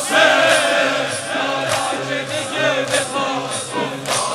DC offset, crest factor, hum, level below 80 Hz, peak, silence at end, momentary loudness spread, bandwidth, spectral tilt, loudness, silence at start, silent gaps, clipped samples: under 0.1%; 18 dB; none; -60 dBFS; 0 dBFS; 0 s; 9 LU; 16 kHz; -2 dB/octave; -18 LUFS; 0 s; none; under 0.1%